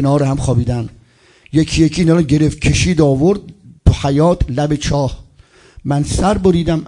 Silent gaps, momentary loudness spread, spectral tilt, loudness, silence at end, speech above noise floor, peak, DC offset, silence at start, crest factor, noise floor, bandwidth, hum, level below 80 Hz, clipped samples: none; 8 LU; -6.5 dB/octave; -15 LUFS; 0 s; 35 dB; 0 dBFS; under 0.1%; 0 s; 14 dB; -48 dBFS; 11 kHz; none; -28 dBFS; under 0.1%